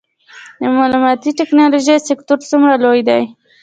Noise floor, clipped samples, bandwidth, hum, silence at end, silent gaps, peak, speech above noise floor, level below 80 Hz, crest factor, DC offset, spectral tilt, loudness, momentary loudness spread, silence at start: -39 dBFS; under 0.1%; 9.2 kHz; none; 0.3 s; none; 0 dBFS; 27 dB; -62 dBFS; 12 dB; under 0.1%; -4 dB/octave; -13 LUFS; 6 LU; 0.35 s